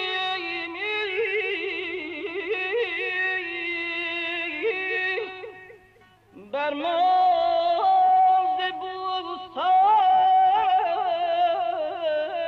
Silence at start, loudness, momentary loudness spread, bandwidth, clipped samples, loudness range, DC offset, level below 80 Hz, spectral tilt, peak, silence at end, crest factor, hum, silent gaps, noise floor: 0 s; -23 LUFS; 11 LU; 6 kHz; under 0.1%; 6 LU; under 0.1%; -68 dBFS; -4 dB/octave; -14 dBFS; 0 s; 10 dB; none; none; -56 dBFS